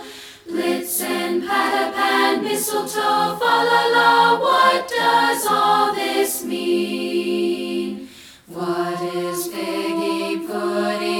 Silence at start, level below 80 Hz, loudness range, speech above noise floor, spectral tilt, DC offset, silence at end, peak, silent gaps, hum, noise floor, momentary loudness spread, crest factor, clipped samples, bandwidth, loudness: 0 s; -64 dBFS; 8 LU; 23 dB; -3 dB/octave; under 0.1%; 0 s; -4 dBFS; none; none; -41 dBFS; 10 LU; 16 dB; under 0.1%; 18.5 kHz; -19 LUFS